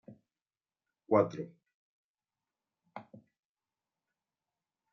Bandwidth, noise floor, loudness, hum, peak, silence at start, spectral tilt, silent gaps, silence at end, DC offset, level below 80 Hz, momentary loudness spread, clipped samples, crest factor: 6.4 kHz; under -90 dBFS; -31 LUFS; none; -12 dBFS; 0.1 s; -7.5 dB/octave; 1.74-2.14 s; 1.9 s; under 0.1%; -86 dBFS; 23 LU; under 0.1%; 28 dB